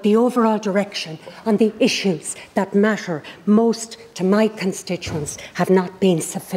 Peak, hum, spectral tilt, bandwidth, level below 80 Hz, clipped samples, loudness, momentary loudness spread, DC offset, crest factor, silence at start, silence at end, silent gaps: -4 dBFS; none; -5 dB/octave; 16 kHz; -56 dBFS; under 0.1%; -20 LUFS; 10 LU; under 0.1%; 14 dB; 0 s; 0 s; none